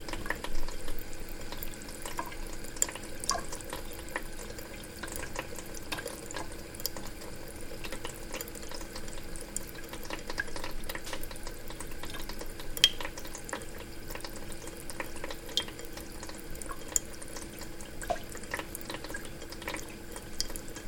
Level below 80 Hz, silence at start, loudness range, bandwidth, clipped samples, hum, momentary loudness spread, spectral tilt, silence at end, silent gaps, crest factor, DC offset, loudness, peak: -42 dBFS; 0 s; 7 LU; 17 kHz; under 0.1%; none; 11 LU; -2 dB/octave; 0 s; none; 36 dB; under 0.1%; -37 LUFS; 0 dBFS